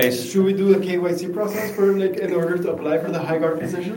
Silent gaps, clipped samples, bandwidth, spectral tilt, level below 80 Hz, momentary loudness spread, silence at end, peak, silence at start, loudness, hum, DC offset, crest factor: none; under 0.1%; 17 kHz; -6 dB/octave; -64 dBFS; 6 LU; 0 s; -2 dBFS; 0 s; -21 LUFS; none; under 0.1%; 18 dB